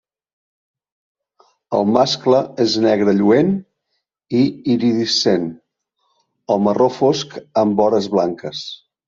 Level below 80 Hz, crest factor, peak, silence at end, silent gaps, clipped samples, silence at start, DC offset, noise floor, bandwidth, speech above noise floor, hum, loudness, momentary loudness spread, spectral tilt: -60 dBFS; 18 dB; 0 dBFS; 0.3 s; none; under 0.1%; 1.7 s; under 0.1%; -73 dBFS; 7.6 kHz; 57 dB; none; -17 LUFS; 8 LU; -5.5 dB/octave